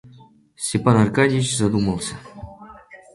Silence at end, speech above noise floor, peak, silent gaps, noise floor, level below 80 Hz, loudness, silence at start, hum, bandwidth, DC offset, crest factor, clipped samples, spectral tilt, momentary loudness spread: 0.2 s; 30 dB; -4 dBFS; none; -49 dBFS; -48 dBFS; -20 LUFS; 0.05 s; none; 11.5 kHz; under 0.1%; 18 dB; under 0.1%; -5.5 dB/octave; 22 LU